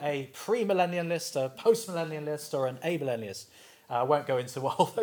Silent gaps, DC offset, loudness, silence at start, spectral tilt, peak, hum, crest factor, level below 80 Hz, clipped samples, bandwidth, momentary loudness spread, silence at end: none; under 0.1%; -30 LUFS; 0 s; -5 dB/octave; -10 dBFS; none; 20 dB; -82 dBFS; under 0.1%; over 20 kHz; 9 LU; 0 s